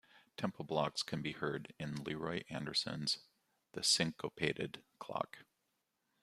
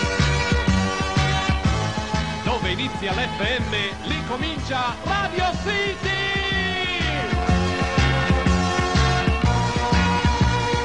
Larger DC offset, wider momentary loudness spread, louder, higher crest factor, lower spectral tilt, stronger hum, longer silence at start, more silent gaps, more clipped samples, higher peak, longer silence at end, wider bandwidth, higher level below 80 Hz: second, under 0.1% vs 0.5%; first, 13 LU vs 5 LU; second, -39 LUFS vs -22 LUFS; first, 22 dB vs 16 dB; second, -3.5 dB/octave vs -5 dB/octave; neither; first, 0.15 s vs 0 s; neither; neither; second, -18 dBFS vs -6 dBFS; first, 0.8 s vs 0 s; first, 15 kHz vs 10.5 kHz; second, -72 dBFS vs -28 dBFS